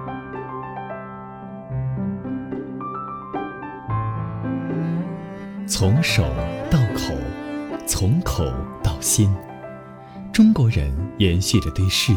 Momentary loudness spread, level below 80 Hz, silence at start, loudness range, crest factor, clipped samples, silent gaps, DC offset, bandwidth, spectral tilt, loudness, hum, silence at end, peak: 15 LU; -34 dBFS; 0 s; 9 LU; 18 dB; under 0.1%; none; under 0.1%; 19.5 kHz; -5 dB/octave; -22 LUFS; none; 0 s; -4 dBFS